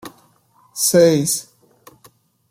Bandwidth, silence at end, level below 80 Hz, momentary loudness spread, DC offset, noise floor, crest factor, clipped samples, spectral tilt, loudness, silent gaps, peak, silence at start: 16.5 kHz; 1.1 s; -60 dBFS; 12 LU; under 0.1%; -56 dBFS; 18 dB; under 0.1%; -4 dB/octave; -16 LUFS; none; -2 dBFS; 0.05 s